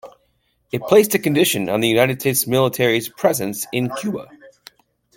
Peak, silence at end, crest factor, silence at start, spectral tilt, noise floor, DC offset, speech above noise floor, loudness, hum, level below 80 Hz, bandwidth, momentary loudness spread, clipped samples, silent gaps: -2 dBFS; 0.7 s; 18 dB; 0.05 s; -4 dB/octave; -65 dBFS; under 0.1%; 47 dB; -18 LUFS; none; -60 dBFS; 17 kHz; 11 LU; under 0.1%; none